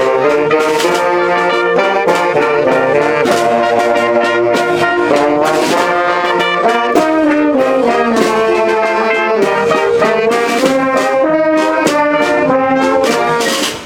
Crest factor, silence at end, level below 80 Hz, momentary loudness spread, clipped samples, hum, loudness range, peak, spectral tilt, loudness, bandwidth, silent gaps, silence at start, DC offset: 12 dB; 0 s; -50 dBFS; 1 LU; under 0.1%; none; 0 LU; 0 dBFS; -4 dB/octave; -12 LUFS; 18 kHz; none; 0 s; under 0.1%